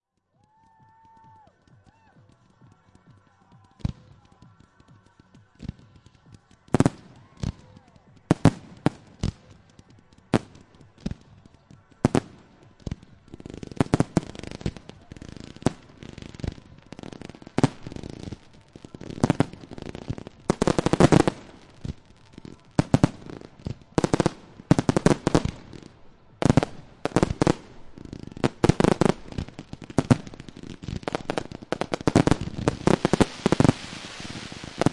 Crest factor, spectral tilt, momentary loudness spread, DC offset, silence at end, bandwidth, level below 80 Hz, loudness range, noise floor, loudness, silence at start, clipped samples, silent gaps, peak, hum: 24 dB; -6.5 dB/octave; 21 LU; under 0.1%; 0 s; 11.5 kHz; -44 dBFS; 11 LU; -68 dBFS; -25 LUFS; 3.85 s; under 0.1%; none; -2 dBFS; none